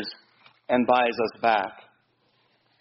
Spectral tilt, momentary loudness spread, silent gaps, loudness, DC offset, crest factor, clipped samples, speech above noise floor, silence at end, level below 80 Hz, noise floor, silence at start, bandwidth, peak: -2 dB/octave; 12 LU; none; -24 LUFS; under 0.1%; 20 dB; under 0.1%; 44 dB; 1 s; -68 dBFS; -67 dBFS; 0 s; 5.8 kHz; -8 dBFS